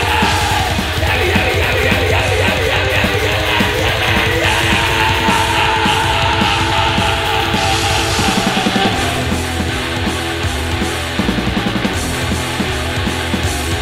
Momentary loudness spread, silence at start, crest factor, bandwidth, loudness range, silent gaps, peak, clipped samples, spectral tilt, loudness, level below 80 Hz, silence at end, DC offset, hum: 5 LU; 0 s; 14 dB; 16.5 kHz; 5 LU; none; 0 dBFS; under 0.1%; -4 dB/octave; -14 LUFS; -26 dBFS; 0 s; under 0.1%; none